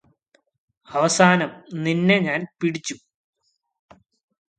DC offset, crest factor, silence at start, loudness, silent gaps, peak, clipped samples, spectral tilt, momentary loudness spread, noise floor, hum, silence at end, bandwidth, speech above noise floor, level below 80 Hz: under 0.1%; 24 dB; 0.9 s; -20 LUFS; none; 0 dBFS; under 0.1%; -4.5 dB/octave; 14 LU; -65 dBFS; none; 1.6 s; 9.4 kHz; 45 dB; -66 dBFS